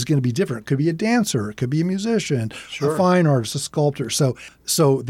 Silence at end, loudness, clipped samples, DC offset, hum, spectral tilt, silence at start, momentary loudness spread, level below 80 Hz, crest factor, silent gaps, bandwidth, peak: 0 s; -21 LUFS; under 0.1%; under 0.1%; none; -5.5 dB/octave; 0 s; 7 LU; -58 dBFS; 14 dB; none; 16 kHz; -6 dBFS